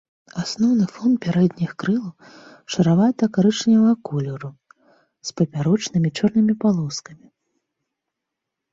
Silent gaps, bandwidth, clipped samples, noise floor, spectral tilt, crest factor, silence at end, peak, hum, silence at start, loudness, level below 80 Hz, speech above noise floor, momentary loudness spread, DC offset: none; 7.8 kHz; under 0.1%; -82 dBFS; -6.5 dB/octave; 16 dB; 1.6 s; -6 dBFS; none; 0.35 s; -20 LUFS; -60 dBFS; 63 dB; 15 LU; under 0.1%